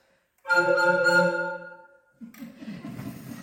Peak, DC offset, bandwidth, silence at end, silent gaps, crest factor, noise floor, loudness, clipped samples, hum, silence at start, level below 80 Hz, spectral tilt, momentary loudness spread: -10 dBFS; under 0.1%; 17 kHz; 0 s; none; 18 dB; -52 dBFS; -22 LUFS; under 0.1%; none; 0.45 s; -68 dBFS; -4.5 dB/octave; 23 LU